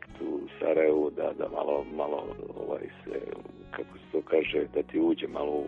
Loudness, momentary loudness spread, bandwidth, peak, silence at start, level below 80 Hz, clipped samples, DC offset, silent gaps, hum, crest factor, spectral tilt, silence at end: -31 LUFS; 15 LU; 4.4 kHz; -12 dBFS; 0 s; -60 dBFS; under 0.1%; under 0.1%; none; none; 18 dB; -7.5 dB/octave; 0 s